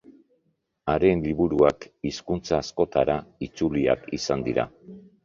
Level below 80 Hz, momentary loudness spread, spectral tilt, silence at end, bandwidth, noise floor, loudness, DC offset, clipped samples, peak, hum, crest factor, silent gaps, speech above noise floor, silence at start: -48 dBFS; 11 LU; -6 dB/octave; 0.25 s; 7.4 kHz; -72 dBFS; -25 LUFS; under 0.1%; under 0.1%; -4 dBFS; none; 20 dB; none; 48 dB; 0.1 s